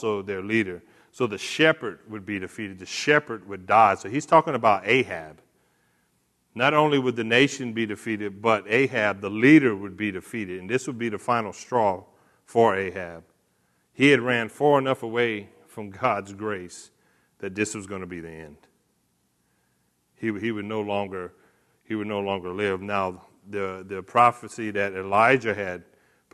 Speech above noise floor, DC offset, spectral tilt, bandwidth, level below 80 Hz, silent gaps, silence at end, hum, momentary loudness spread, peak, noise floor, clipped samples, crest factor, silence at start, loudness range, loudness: 46 dB; under 0.1%; -5 dB/octave; 12.5 kHz; -68 dBFS; none; 0.55 s; none; 17 LU; -4 dBFS; -70 dBFS; under 0.1%; 22 dB; 0 s; 11 LU; -24 LUFS